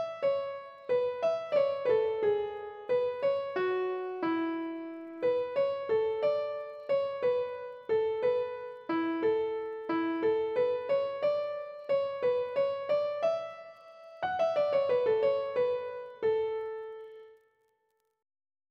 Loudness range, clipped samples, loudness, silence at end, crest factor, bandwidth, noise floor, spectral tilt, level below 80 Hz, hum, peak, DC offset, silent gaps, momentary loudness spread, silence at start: 2 LU; under 0.1%; -31 LUFS; 1.35 s; 14 dB; 6.4 kHz; -77 dBFS; -6.5 dB/octave; -74 dBFS; none; -18 dBFS; under 0.1%; none; 11 LU; 0 s